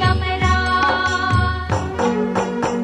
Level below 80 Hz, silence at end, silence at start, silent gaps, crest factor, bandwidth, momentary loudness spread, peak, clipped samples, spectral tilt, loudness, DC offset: -30 dBFS; 0 s; 0 s; none; 14 dB; 10.5 kHz; 5 LU; -4 dBFS; under 0.1%; -5.5 dB/octave; -18 LUFS; under 0.1%